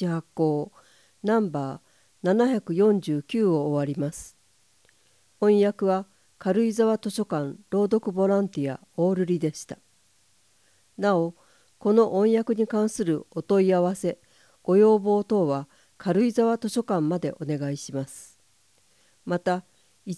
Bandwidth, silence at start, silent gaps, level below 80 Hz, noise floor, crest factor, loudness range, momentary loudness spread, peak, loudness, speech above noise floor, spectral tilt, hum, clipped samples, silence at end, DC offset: 11 kHz; 0 s; none; -68 dBFS; -64 dBFS; 18 dB; 4 LU; 13 LU; -8 dBFS; -25 LUFS; 41 dB; -7 dB/octave; none; under 0.1%; 0 s; under 0.1%